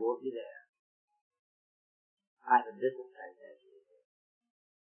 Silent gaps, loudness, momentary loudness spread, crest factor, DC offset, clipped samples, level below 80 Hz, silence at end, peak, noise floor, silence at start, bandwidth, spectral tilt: 0.69-0.73 s, 0.79-1.08 s, 1.21-1.31 s, 1.39-2.17 s, 2.27-2.37 s; -33 LUFS; 21 LU; 26 dB; under 0.1%; under 0.1%; under -90 dBFS; 1.3 s; -14 dBFS; -65 dBFS; 0 s; 3.2 kHz; 2.5 dB/octave